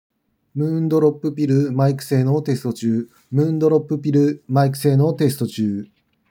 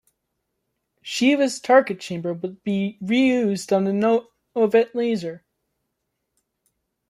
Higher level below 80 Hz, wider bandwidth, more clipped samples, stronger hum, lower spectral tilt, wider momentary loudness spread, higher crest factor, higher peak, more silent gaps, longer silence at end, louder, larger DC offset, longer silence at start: about the same, -72 dBFS vs -70 dBFS; first, 19 kHz vs 13 kHz; neither; neither; first, -8 dB/octave vs -5.5 dB/octave; second, 7 LU vs 11 LU; second, 14 dB vs 20 dB; about the same, -4 dBFS vs -4 dBFS; neither; second, 0.45 s vs 1.7 s; about the same, -19 LUFS vs -21 LUFS; neither; second, 0.55 s vs 1.05 s